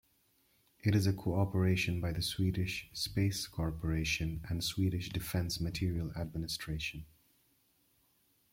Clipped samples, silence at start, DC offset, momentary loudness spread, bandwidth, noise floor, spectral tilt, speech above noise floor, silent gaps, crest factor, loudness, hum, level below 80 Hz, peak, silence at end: under 0.1%; 0.85 s; under 0.1%; 7 LU; 16.5 kHz; -73 dBFS; -5 dB/octave; 39 dB; none; 18 dB; -35 LUFS; none; -52 dBFS; -18 dBFS; 1.45 s